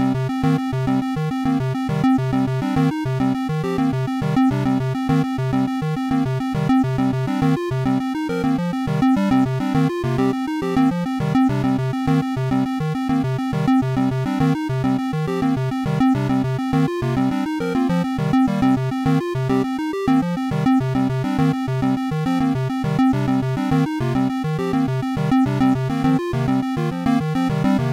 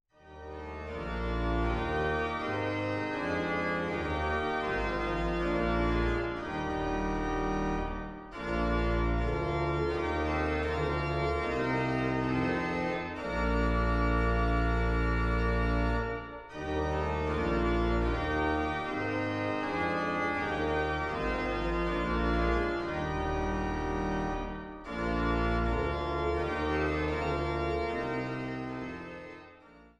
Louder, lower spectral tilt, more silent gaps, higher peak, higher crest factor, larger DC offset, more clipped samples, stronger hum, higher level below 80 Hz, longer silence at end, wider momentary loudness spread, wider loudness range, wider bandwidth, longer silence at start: first, -20 LUFS vs -32 LUFS; about the same, -8 dB/octave vs -7 dB/octave; neither; first, -10 dBFS vs -16 dBFS; about the same, 10 dB vs 14 dB; first, 0.1% vs under 0.1%; neither; neither; second, -44 dBFS vs -38 dBFS; about the same, 0 s vs 0.1 s; second, 4 LU vs 7 LU; about the same, 1 LU vs 2 LU; first, 13 kHz vs 8.8 kHz; second, 0 s vs 0.25 s